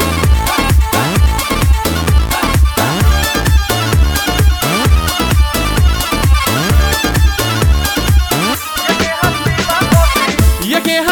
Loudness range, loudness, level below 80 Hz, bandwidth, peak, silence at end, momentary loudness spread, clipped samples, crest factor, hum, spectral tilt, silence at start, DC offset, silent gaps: 0 LU; -12 LUFS; -14 dBFS; over 20 kHz; 0 dBFS; 0 s; 2 LU; under 0.1%; 12 dB; none; -4.5 dB/octave; 0 s; under 0.1%; none